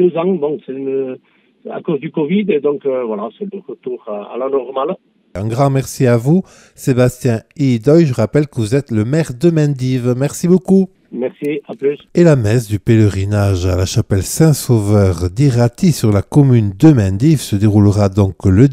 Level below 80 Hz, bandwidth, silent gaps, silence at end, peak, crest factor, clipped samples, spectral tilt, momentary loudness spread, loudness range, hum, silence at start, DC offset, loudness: -44 dBFS; 16 kHz; none; 0 s; 0 dBFS; 14 dB; under 0.1%; -7.5 dB/octave; 12 LU; 7 LU; none; 0 s; under 0.1%; -14 LUFS